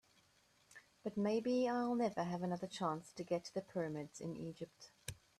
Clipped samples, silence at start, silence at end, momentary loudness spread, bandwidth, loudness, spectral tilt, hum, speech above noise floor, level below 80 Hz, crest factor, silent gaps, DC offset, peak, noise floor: under 0.1%; 0.7 s; 0.25 s; 15 LU; 13.5 kHz; -41 LUFS; -6 dB/octave; none; 33 dB; -76 dBFS; 16 dB; none; under 0.1%; -26 dBFS; -73 dBFS